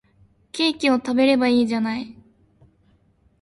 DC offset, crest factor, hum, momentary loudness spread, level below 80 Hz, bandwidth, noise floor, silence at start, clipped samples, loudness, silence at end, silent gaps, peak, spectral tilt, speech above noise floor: under 0.1%; 18 dB; none; 14 LU; -60 dBFS; 11.5 kHz; -60 dBFS; 0.55 s; under 0.1%; -20 LUFS; 1.3 s; none; -6 dBFS; -4.5 dB/octave; 41 dB